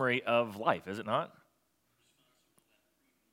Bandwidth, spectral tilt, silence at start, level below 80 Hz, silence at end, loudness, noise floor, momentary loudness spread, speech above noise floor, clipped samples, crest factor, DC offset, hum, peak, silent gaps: 16.5 kHz; -6 dB/octave; 0 s; -84 dBFS; 2.05 s; -32 LUFS; -76 dBFS; 7 LU; 44 dB; under 0.1%; 24 dB; under 0.1%; none; -12 dBFS; none